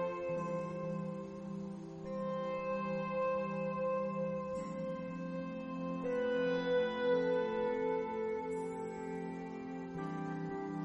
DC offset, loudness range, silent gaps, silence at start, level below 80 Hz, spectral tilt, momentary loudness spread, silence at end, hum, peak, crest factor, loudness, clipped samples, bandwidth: under 0.1%; 4 LU; none; 0 s; -68 dBFS; -7.5 dB/octave; 10 LU; 0 s; none; -24 dBFS; 14 dB; -38 LUFS; under 0.1%; 9.6 kHz